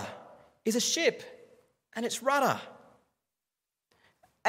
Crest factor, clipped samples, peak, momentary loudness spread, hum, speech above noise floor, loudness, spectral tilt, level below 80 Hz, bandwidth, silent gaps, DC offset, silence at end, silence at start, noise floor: 22 dB; under 0.1%; -12 dBFS; 22 LU; none; 60 dB; -29 LUFS; -2 dB/octave; -82 dBFS; 16 kHz; none; under 0.1%; 0 s; 0 s; -89 dBFS